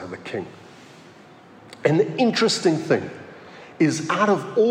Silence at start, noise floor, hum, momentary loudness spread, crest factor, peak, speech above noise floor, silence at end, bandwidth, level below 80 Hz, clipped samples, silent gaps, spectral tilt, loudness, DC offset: 0 s; -47 dBFS; none; 21 LU; 18 dB; -4 dBFS; 26 dB; 0 s; 13.5 kHz; -72 dBFS; under 0.1%; none; -5 dB/octave; -21 LUFS; under 0.1%